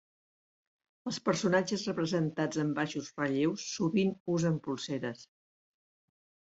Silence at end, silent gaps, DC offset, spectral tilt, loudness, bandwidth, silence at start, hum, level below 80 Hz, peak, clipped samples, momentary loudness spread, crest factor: 1.3 s; 4.20-4.26 s; under 0.1%; -5.5 dB/octave; -32 LUFS; 8 kHz; 1.05 s; none; -72 dBFS; -12 dBFS; under 0.1%; 8 LU; 20 dB